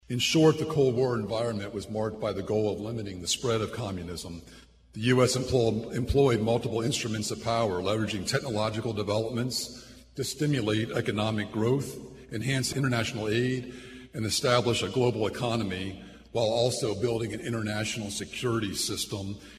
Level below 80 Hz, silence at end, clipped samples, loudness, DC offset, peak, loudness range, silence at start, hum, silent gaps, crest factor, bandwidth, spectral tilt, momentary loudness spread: -52 dBFS; 0 s; under 0.1%; -28 LUFS; under 0.1%; -8 dBFS; 3 LU; 0.1 s; none; none; 20 dB; 14 kHz; -5 dB/octave; 11 LU